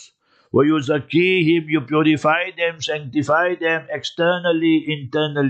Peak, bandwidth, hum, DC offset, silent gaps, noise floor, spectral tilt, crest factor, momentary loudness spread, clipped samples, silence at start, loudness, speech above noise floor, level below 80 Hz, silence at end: -4 dBFS; 8.4 kHz; none; under 0.1%; none; -53 dBFS; -6 dB/octave; 14 dB; 6 LU; under 0.1%; 0 s; -19 LUFS; 35 dB; -66 dBFS; 0 s